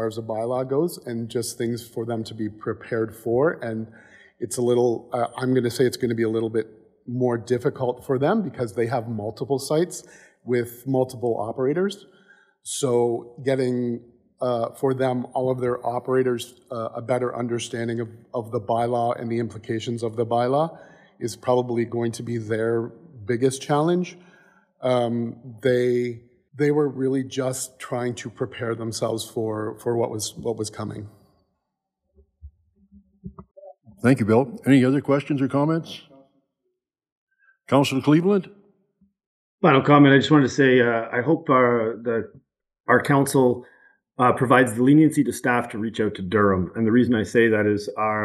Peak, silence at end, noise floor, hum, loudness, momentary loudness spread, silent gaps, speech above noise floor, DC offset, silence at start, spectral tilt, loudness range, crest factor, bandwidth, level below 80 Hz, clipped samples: -2 dBFS; 0 s; -80 dBFS; none; -23 LUFS; 13 LU; 37.12-37.27 s, 39.26-39.58 s, 42.80-42.84 s; 58 dB; under 0.1%; 0 s; -6 dB/octave; 8 LU; 20 dB; 15.5 kHz; -62 dBFS; under 0.1%